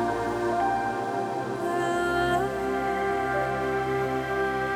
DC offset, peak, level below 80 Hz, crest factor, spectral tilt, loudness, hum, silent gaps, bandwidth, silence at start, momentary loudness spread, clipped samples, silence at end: under 0.1%; -14 dBFS; -50 dBFS; 14 dB; -5.5 dB/octave; -27 LUFS; none; none; 19 kHz; 0 s; 4 LU; under 0.1%; 0 s